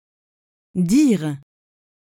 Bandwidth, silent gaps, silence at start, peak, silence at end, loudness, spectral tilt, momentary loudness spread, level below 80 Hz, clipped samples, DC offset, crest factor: 16 kHz; none; 0.75 s; -6 dBFS; 0.75 s; -19 LUFS; -6.5 dB/octave; 15 LU; -56 dBFS; under 0.1%; under 0.1%; 16 dB